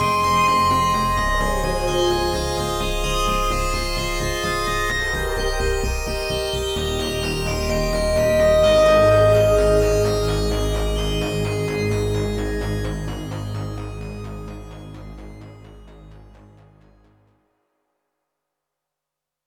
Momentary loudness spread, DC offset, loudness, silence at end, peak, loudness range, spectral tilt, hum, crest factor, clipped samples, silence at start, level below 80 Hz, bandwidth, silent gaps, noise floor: 17 LU; under 0.1%; -20 LUFS; 3.2 s; -4 dBFS; 16 LU; -4.5 dB/octave; none; 16 dB; under 0.1%; 0 s; -30 dBFS; 20 kHz; none; -85 dBFS